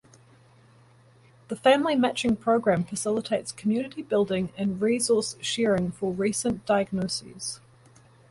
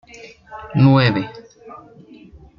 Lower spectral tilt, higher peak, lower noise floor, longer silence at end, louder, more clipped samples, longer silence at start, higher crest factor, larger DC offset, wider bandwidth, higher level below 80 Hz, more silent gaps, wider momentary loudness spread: second, -4.5 dB/octave vs -8 dB/octave; second, -8 dBFS vs -2 dBFS; first, -56 dBFS vs -44 dBFS; about the same, 0.75 s vs 0.85 s; second, -26 LUFS vs -16 LUFS; neither; first, 1.5 s vs 0.25 s; about the same, 20 dB vs 18 dB; neither; first, 11.5 kHz vs 6.8 kHz; second, -60 dBFS vs -50 dBFS; neither; second, 9 LU vs 24 LU